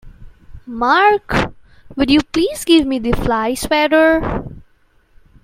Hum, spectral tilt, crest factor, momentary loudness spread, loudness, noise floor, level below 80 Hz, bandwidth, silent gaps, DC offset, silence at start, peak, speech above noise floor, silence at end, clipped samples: none; -4.5 dB/octave; 16 dB; 13 LU; -15 LUFS; -54 dBFS; -34 dBFS; 16 kHz; none; under 0.1%; 0.05 s; 0 dBFS; 40 dB; 0.85 s; under 0.1%